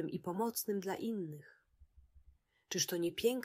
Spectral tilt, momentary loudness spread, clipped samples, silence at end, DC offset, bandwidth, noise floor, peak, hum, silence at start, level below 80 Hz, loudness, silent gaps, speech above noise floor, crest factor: -3.5 dB/octave; 8 LU; under 0.1%; 0 s; under 0.1%; 16 kHz; -68 dBFS; -20 dBFS; none; 0 s; -70 dBFS; -38 LUFS; none; 31 dB; 18 dB